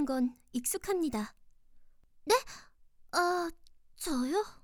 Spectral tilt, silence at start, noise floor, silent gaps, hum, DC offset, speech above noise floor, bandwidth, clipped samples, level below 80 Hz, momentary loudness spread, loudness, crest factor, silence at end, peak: -3 dB/octave; 0 s; -57 dBFS; none; none; under 0.1%; 24 dB; over 20 kHz; under 0.1%; -58 dBFS; 13 LU; -33 LUFS; 20 dB; 0.1 s; -14 dBFS